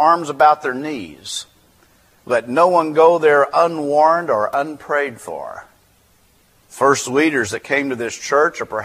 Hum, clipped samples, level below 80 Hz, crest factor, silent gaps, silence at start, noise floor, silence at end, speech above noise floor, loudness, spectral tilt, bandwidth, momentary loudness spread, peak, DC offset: none; under 0.1%; -62 dBFS; 18 dB; none; 0 s; -55 dBFS; 0 s; 39 dB; -17 LUFS; -4 dB/octave; 15.5 kHz; 14 LU; 0 dBFS; under 0.1%